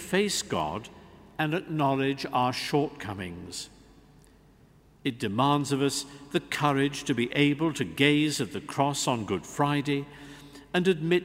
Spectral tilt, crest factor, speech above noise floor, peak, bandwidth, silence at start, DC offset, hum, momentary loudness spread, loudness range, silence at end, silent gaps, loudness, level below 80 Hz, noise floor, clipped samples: -4.5 dB/octave; 22 dB; 30 dB; -6 dBFS; 16 kHz; 0 s; under 0.1%; none; 13 LU; 5 LU; 0 s; none; -28 LUFS; -60 dBFS; -58 dBFS; under 0.1%